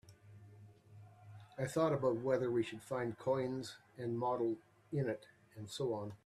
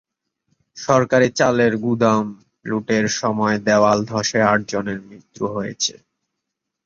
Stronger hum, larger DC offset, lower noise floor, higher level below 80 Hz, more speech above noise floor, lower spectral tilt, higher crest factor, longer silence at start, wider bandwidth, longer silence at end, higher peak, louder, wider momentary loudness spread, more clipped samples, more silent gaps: neither; neither; second, -59 dBFS vs -80 dBFS; second, -74 dBFS vs -56 dBFS; second, 22 dB vs 62 dB; first, -6.5 dB/octave vs -4.5 dB/octave; about the same, 18 dB vs 18 dB; second, 0.1 s vs 0.75 s; first, 14 kHz vs 7.6 kHz; second, 0.1 s vs 0.95 s; second, -20 dBFS vs -2 dBFS; second, -39 LUFS vs -19 LUFS; first, 22 LU vs 12 LU; neither; neither